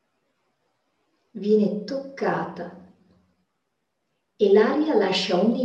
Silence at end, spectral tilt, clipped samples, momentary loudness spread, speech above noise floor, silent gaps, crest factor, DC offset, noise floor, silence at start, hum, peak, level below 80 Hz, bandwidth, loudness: 0 s; -6 dB/octave; under 0.1%; 16 LU; 56 dB; none; 18 dB; under 0.1%; -77 dBFS; 1.35 s; none; -6 dBFS; -72 dBFS; 8.4 kHz; -22 LUFS